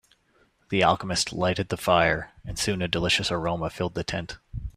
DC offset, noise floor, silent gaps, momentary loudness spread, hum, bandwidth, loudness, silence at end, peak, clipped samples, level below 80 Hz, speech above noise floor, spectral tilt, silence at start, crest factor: under 0.1%; -65 dBFS; none; 10 LU; none; 15.5 kHz; -25 LUFS; 0.1 s; -6 dBFS; under 0.1%; -46 dBFS; 39 dB; -4 dB/octave; 0.7 s; 22 dB